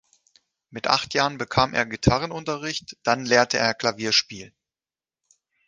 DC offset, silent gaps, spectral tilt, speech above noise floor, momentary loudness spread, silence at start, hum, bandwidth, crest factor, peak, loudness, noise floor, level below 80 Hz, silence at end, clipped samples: under 0.1%; none; -3.5 dB/octave; over 67 dB; 11 LU; 0.75 s; none; 10 kHz; 22 dB; -2 dBFS; -22 LUFS; under -90 dBFS; -46 dBFS; 1.2 s; under 0.1%